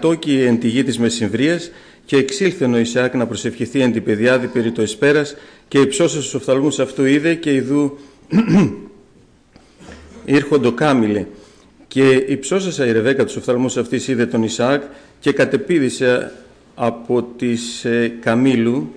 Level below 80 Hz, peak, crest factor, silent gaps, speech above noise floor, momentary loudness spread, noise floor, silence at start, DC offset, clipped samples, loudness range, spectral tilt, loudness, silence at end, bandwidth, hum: -54 dBFS; -4 dBFS; 12 dB; none; 34 dB; 7 LU; -50 dBFS; 0 s; under 0.1%; under 0.1%; 2 LU; -5.5 dB/octave; -17 LUFS; 0 s; 10.5 kHz; none